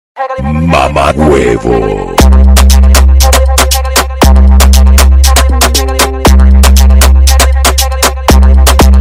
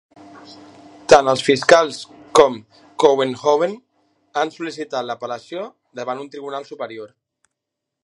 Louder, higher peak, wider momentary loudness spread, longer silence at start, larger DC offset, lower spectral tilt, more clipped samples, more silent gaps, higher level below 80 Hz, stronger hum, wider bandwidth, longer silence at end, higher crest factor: first, -6 LUFS vs -18 LUFS; about the same, 0 dBFS vs 0 dBFS; second, 5 LU vs 20 LU; second, 0.15 s vs 0.35 s; neither; about the same, -4.5 dB/octave vs -3.5 dB/octave; first, 2% vs under 0.1%; neither; first, -6 dBFS vs -58 dBFS; neither; first, 16.5 kHz vs 11.5 kHz; second, 0 s vs 1 s; second, 4 dB vs 20 dB